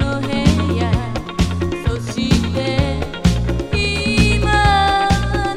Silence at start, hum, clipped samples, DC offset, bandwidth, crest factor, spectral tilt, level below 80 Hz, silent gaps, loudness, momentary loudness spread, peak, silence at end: 0 s; none; under 0.1%; under 0.1%; 14.5 kHz; 16 dB; -5.5 dB/octave; -24 dBFS; none; -17 LUFS; 7 LU; 0 dBFS; 0 s